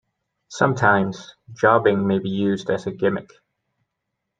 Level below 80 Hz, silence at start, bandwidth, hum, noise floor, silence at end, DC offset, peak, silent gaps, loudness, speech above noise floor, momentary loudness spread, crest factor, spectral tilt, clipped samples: -60 dBFS; 0.5 s; 9 kHz; none; -79 dBFS; 1.15 s; under 0.1%; -2 dBFS; none; -20 LUFS; 59 dB; 12 LU; 20 dB; -6.5 dB/octave; under 0.1%